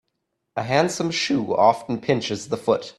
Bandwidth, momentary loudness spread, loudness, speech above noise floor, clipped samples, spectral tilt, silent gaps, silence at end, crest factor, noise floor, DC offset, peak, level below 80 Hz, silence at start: 13 kHz; 8 LU; -22 LUFS; 55 dB; under 0.1%; -4.5 dB/octave; none; 0.1 s; 20 dB; -77 dBFS; under 0.1%; -4 dBFS; -62 dBFS; 0.55 s